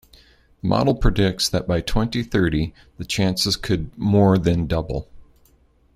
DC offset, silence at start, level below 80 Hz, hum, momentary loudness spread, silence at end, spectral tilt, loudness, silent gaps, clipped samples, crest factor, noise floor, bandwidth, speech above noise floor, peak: under 0.1%; 0.65 s; -32 dBFS; none; 10 LU; 0.75 s; -5.5 dB/octave; -21 LUFS; none; under 0.1%; 18 dB; -57 dBFS; 15.5 kHz; 37 dB; -2 dBFS